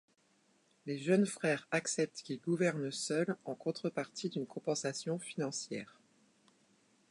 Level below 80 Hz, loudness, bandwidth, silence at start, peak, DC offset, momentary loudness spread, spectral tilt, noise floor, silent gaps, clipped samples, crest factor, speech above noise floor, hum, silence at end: -86 dBFS; -36 LUFS; 11 kHz; 0.85 s; -18 dBFS; under 0.1%; 9 LU; -4.5 dB/octave; -72 dBFS; none; under 0.1%; 20 dB; 36 dB; none; 1.25 s